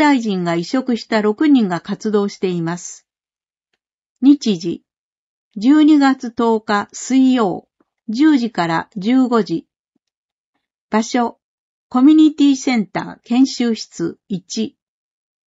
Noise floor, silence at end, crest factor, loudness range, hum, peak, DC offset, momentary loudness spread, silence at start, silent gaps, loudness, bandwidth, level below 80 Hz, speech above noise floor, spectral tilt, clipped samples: under -90 dBFS; 0.75 s; 16 dB; 4 LU; none; -2 dBFS; under 0.1%; 14 LU; 0 s; 3.94-3.98 s, 4.06-4.15 s, 4.98-5.51 s, 9.79-9.92 s, 10.17-10.53 s, 10.81-10.89 s, 11.42-11.90 s; -16 LUFS; 8 kHz; -66 dBFS; over 75 dB; -5.5 dB/octave; under 0.1%